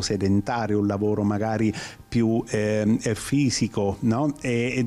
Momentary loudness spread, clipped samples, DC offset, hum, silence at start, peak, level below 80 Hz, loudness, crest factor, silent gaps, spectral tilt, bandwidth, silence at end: 3 LU; under 0.1%; under 0.1%; none; 0 s; -12 dBFS; -50 dBFS; -24 LUFS; 10 dB; none; -6 dB/octave; 13.5 kHz; 0 s